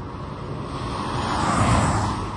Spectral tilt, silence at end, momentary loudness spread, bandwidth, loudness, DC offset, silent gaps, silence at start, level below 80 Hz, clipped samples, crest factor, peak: -5.5 dB/octave; 0 s; 13 LU; 11.5 kHz; -24 LUFS; under 0.1%; none; 0 s; -36 dBFS; under 0.1%; 18 dB; -6 dBFS